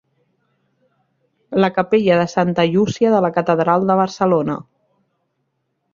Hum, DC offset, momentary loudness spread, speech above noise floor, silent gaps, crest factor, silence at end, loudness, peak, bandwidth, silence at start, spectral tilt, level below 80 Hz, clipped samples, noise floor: none; under 0.1%; 4 LU; 55 dB; none; 16 dB; 1.3 s; -17 LUFS; -2 dBFS; 7.4 kHz; 1.5 s; -7 dB/octave; -58 dBFS; under 0.1%; -71 dBFS